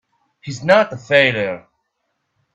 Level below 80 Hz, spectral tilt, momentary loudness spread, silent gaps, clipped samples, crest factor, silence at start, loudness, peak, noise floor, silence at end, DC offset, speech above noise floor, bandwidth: -60 dBFS; -5 dB/octave; 18 LU; none; under 0.1%; 20 dB; 0.45 s; -16 LUFS; 0 dBFS; -72 dBFS; 0.95 s; under 0.1%; 56 dB; 8.4 kHz